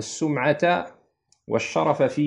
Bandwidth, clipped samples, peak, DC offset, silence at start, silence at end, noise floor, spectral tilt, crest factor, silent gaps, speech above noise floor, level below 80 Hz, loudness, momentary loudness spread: 10.5 kHz; under 0.1%; -6 dBFS; under 0.1%; 0 s; 0 s; -65 dBFS; -5.5 dB/octave; 18 dB; none; 42 dB; -68 dBFS; -23 LUFS; 7 LU